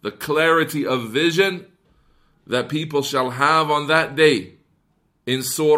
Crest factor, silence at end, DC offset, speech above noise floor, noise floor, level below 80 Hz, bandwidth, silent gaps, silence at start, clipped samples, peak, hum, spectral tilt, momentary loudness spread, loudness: 18 dB; 0 s; under 0.1%; 46 dB; -65 dBFS; -62 dBFS; 16 kHz; none; 0.05 s; under 0.1%; -2 dBFS; none; -4 dB/octave; 8 LU; -19 LUFS